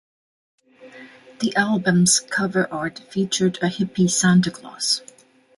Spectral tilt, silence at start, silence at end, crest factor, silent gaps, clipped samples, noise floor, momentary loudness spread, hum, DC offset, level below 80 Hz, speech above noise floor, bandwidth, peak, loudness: -4 dB/octave; 0.85 s; 0.6 s; 18 dB; none; under 0.1%; -44 dBFS; 10 LU; none; under 0.1%; -60 dBFS; 24 dB; 11.5 kHz; -4 dBFS; -20 LUFS